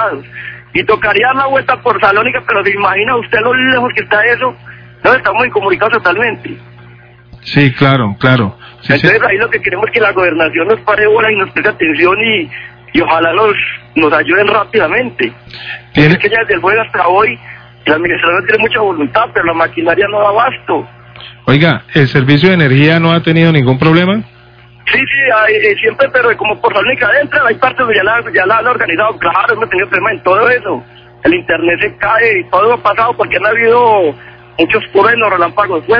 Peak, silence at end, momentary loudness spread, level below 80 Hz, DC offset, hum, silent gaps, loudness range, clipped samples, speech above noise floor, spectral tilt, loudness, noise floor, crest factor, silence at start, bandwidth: 0 dBFS; 0 s; 8 LU; -44 dBFS; under 0.1%; 60 Hz at -35 dBFS; none; 2 LU; 0.5%; 29 dB; -8 dB/octave; -10 LUFS; -39 dBFS; 10 dB; 0 s; 5.4 kHz